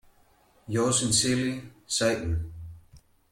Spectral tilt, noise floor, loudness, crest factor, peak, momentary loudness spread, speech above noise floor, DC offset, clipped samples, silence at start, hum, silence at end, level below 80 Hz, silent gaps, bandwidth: -3.5 dB/octave; -62 dBFS; -26 LUFS; 20 dB; -10 dBFS; 18 LU; 35 dB; under 0.1%; under 0.1%; 0.7 s; none; 0.35 s; -48 dBFS; none; 16.5 kHz